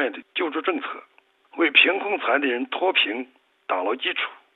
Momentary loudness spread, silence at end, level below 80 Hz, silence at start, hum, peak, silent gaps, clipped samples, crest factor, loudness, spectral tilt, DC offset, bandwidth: 19 LU; 0.2 s; -82 dBFS; 0 s; none; 0 dBFS; none; under 0.1%; 24 dB; -22 LUFS; -5 dB/octave; under 0.1%; 4.2 kHz